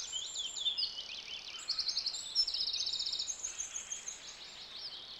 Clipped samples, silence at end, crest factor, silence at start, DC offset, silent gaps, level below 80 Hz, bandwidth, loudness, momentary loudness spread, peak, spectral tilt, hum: under 0.1%; 0 s; 18 dB; 0 s; under 0.1%; none; -70 dBFS; 16 kHz; -36 LUFS; 12 LU; -22 dBFS; 2.5 dB/octave; none